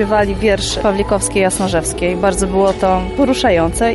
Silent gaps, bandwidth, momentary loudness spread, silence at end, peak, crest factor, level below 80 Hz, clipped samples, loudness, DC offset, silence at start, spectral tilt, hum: none; 12 kHz; 3 LU; 0 s; -2 dBFS; 12 dB; -28 dBFS; under 0.1%; -15 LUFS; under 0.1%; 0 s; -4.5 dB/octave; none